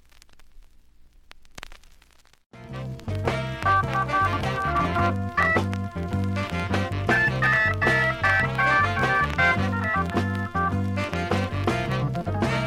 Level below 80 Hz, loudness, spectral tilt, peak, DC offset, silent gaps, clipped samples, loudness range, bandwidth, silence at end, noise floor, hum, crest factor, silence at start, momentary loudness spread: -42 dBFS; -23 LUFS; -6 dB/octave; -6 dBFS; under 0.1%; 2.46-2.50 s; under 0.1%; 8 LU; 14 kHz; 0 s; -55 dBFS; none; 18 dB; 0.35 s; 9 LU